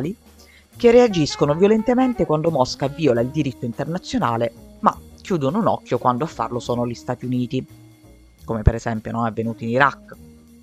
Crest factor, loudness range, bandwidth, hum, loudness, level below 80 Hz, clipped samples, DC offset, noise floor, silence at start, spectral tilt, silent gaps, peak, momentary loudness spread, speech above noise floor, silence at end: 20 dB; 6 LU; 14.5 kHz; none; -20 LUFS; -36 dBFS; under 0.1%; under 0.1%; -49 dBFS; 0 s; -6.5 dB/octave; none; 0 dBFS; 11 LU; 29 dB; 0.3 s